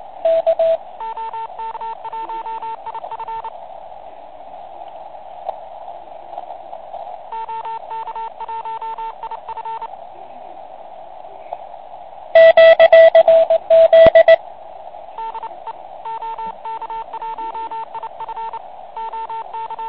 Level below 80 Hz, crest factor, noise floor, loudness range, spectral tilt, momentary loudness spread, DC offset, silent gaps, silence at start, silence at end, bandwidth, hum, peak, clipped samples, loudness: -52 dBFS; 18 dB; -37 dBFS; 22 LU; -8 dB/octave; 28 LU; 0.9%; none; 0.25 s; 0 s; 5 kHz; none; 0 dBFS; under 0.1%; -14 LUFS